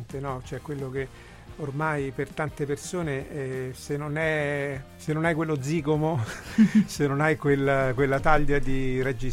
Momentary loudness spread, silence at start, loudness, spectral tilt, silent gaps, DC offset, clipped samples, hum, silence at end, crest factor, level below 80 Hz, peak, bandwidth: 11 LU; 0 s; -27 LUFS; -6.5 dB/octave; none; under 0.1%; under 0.1%; none; 0 s; 20 dB; -38 dBFS; -6 dBFS; 15 kHz